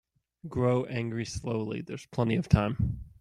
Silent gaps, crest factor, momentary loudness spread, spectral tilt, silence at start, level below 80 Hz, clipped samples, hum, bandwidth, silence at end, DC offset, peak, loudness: none; 24 dB; 12 LU; -7 dB/octave; 0.45 s; -44 dBFS; under 0.1%; none; 11 kHz; 0.1 s; under 0.1%; -6 dBFS; -30 LUFS